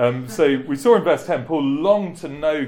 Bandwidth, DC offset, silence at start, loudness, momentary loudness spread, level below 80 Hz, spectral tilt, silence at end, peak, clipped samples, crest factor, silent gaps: 17 kHz; under 0.1%; 0 s; -19 LUFS; 6 LU; -54 dBFS; -6 dB/octave; 0 s; -2 dBFS; under 0.1%; 16 dB; none